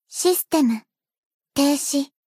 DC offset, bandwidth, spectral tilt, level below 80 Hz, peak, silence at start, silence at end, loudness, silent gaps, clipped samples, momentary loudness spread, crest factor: under 0.1%; 15.5 kHz; -2.5 dB/octave; -64 dBFS; -6 dBFS; 0.1 s; 0.2 s; -21 LUFS; 1.18-1.40 s; under 0.1%; 8 LU; 16 dB